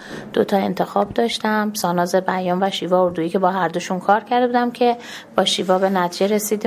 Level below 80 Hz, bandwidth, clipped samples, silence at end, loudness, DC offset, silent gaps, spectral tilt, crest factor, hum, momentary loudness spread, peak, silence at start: -58 dBFS; 16 kHz; under 0.1%; 0 s; -19 LUFS; under 0.1%; none; -4.5 dB/octave; 18 dB; none; 4 LU; 0 dBFS; 0 s